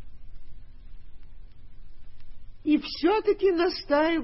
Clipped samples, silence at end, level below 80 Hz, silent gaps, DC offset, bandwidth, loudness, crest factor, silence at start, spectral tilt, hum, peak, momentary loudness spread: under 0.1%; 0 s; -48 dBFS; none; under 0.1%; 6 kHz; -25 LUFS; 16 dB; 0 s; -7 dB/octave; none; -12 dBFS; 3 LU